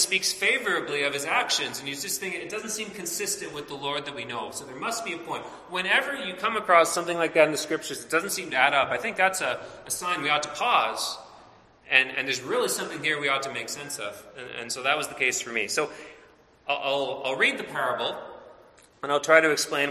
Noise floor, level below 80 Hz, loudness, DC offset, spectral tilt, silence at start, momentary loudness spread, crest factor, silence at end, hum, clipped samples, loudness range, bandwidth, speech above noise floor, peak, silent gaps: -55 dBFS; -68 dBFS; -25 LUFS; under 0.1%; -1.5 dB/octave; 0 s; 12 LU; 24 dB; 0 s; none; under 0.1%; 6 LU; 15.5 kHz; 29 dB; -2 dBFS; none